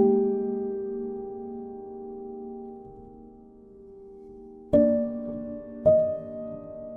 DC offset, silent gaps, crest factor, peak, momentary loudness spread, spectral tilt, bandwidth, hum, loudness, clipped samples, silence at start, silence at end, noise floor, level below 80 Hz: under 0.1%; none; 20 dB; -8 dBFS; 25 LU; -11 dB/octave; 3.5 kHz; none; -28 LUFS; under 0.1%; 0 s; 0 s; -50 dBFS; -56 dBFS